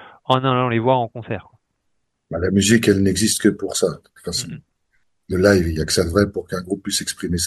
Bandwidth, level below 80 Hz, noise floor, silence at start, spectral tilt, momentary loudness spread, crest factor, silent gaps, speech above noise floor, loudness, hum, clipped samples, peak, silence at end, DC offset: 12.5 kHz; -42 dBFS; -73 dBFS; 0 s; -4.5 dB/octave; 15 LU; 20 dB; none; 54 dB; -19 LUFS; none; under 0.1%; 0 dBFS; 0 s; under 0.1%